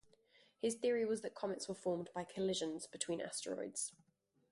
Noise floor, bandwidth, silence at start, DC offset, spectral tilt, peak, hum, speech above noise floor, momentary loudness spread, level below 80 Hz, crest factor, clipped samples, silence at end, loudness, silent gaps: -71 dBFS; 11.5 kHz; 0.65 s; under 0.1%; -3.5 dB/octave; -24 dBFS; none; 30 dB; 7 LU; -80 dBFS; 18 dB; under 0.1%; 0.6 s; -41 LUFS; none